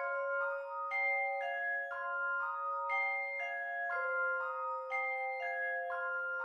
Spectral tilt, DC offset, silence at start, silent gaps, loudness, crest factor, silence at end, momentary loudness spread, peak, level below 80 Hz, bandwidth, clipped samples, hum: -1 dB/octave; under 0.1%; 0 s; none; -36 LUFS; 12 dB; 0 s; 4 LU; -24 dBFS; -86 dBFS; 8.8 kHz; under 0.1%; none